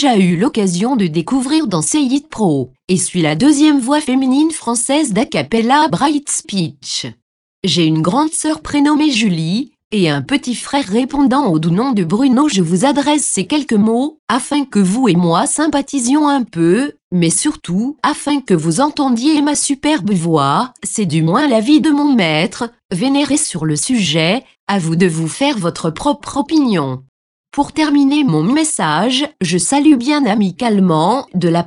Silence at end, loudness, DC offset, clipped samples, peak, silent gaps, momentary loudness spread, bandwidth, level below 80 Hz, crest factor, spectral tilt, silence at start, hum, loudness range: 0 s; -14 LUFS; under 0.1%; under 0.1%; 0 dBFS; 2.84-2.88 s, 7.22-7.62 s, 9.84-9.90 s, 14.19-14.27 s, 17.02-17.11 s, 22.85-22.89 s, 24.60-24.67 s, 27.09-27.44 s; 7 LU; 11.5 kHz; -50 dBFS; 14 dB; -4.5 dB/octave; 0 s; none; 2 LU